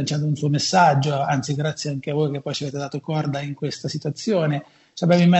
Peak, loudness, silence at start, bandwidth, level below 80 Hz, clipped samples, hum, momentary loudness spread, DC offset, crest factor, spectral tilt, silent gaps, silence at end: -2 dBFS; -22 LUFS; 0 s; 8.2 kHz; -62 dBFS; under 0.1%; none; 11 LU; under 0.1%; 18 dB; -6 dB/octave; none; 0 s